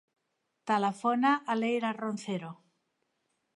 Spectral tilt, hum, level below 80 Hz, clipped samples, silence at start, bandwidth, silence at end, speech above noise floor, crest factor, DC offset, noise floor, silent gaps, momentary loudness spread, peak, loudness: -5.5 dB/octave; none; -86 dBFS; under 0.1%; 0.65 s; 11.5 kHz; 1 s; 51 dB; 18 dB; under 0.1%; -81 dBFS; none; 11 LU; -14 dBFS; -30 LUFS